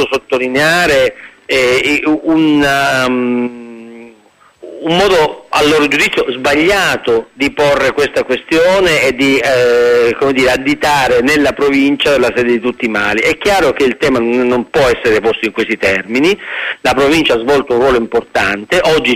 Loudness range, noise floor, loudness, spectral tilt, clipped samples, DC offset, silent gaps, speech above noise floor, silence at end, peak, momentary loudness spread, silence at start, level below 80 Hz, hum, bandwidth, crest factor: 3 LU; -46 dBFS; -11 LUFS; -4 dB/octave; under 0.1%; under 0.1%; none; 35 dB; 0 s; 0 dBFS; 6 LU; 0 s; -40 dBFS; none; 15.5 kHz; 10 dB